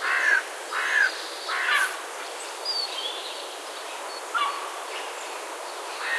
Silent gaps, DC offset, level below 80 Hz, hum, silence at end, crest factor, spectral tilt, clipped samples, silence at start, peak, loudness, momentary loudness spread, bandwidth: none; under 0.1%; under -90 dBFS; none; 0 s; 18 dB; 4 dB/octave; under 0.1%; 0 s; -10 dBFS; -27 LUFS; 12 LU; 14.5 kHz